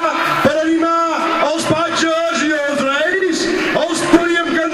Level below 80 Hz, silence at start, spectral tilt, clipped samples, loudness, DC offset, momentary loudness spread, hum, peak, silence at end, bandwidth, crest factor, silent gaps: -48 dBFS; 0 s; -3.5 dB/octave; under 0.1%; -15 LUFS; under 0.1%; 3 LU; none; 0 dBFS; 0 s; 15.5 kHz; 16 dB; none